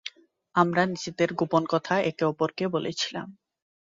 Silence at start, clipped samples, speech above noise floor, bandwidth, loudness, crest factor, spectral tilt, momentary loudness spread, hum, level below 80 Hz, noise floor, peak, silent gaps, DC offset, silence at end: 0.05 s; under 0.1%; 19 dB; 7.8 kHz; -26 LUFS; 20 dB; -5 dB/octave; 7 LU; none; -68 dBFS; -45 dBFS; -8 dBFS; none; under 0.1%; 0.65 s